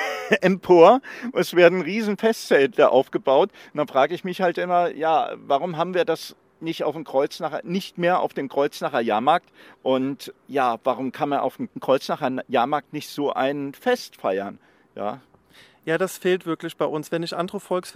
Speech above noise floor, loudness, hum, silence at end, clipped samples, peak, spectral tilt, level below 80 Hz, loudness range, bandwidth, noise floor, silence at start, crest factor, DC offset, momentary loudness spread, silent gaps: 32 dB; -22 LUFS; none; 0.05 s; under 0.1%; 0 dBFS; -5.5 dB/octave; -72 dBFS; 9 LU; 16 kHz; -53 dBFS; 0 s; 22 dB; under 0.1%; 12 LU; none